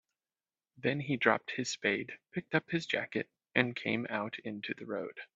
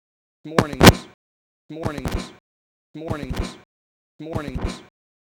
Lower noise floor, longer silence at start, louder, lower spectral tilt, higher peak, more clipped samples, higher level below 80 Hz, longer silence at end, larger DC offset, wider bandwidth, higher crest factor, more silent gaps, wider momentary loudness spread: about the same, under -90 dBFS vs under -90 dBFS; first, 0.8 s vs 0.45 s; second, -34 LUFS vs -21 LUFS; about the same, -4.5 dB/octave vs -5 dB/octave; second, -10 dBFS vs 0 dBFS; neither; second, -76 dBFS vs -34 dBFS; second, 0.1 s vs 0.45 s; neither; second, 8 kHz vs over 20 kHz; about the same, 26 dB vs 22 dB; second, none vs 1.14-1.69 s, 2.40-2.94 s, 3.65-4.19 s; second, 10 LU vs 25 LU